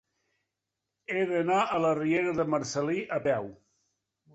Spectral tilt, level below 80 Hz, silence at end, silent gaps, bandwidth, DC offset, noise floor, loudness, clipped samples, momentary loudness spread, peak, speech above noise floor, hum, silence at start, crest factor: -5.5 dB/octave; -68 dBFS; 0.8 s; none; 8.2 kHz; under 0.1%; -86 dBFS; -28 LUFS; under 0.1%; 7 LU; -14 dBFS; 58 dB; none; 1.1 s; 16 dB